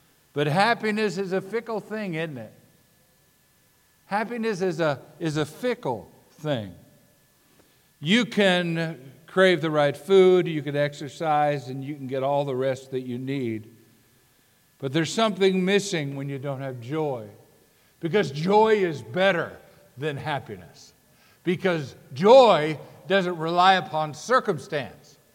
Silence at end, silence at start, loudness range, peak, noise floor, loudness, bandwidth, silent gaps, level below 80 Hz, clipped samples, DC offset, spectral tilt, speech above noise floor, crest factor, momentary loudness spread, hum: 0.4 s; 0.35 s; 9 LU; -4 dBFS; -62 dBFS; -24 LUFS; 16.5 kHz; none; -70 dBFS; under 0.1%; under 0.1%; -5.5 dB/octave; 39 dB; 22 dB; 14 LU; none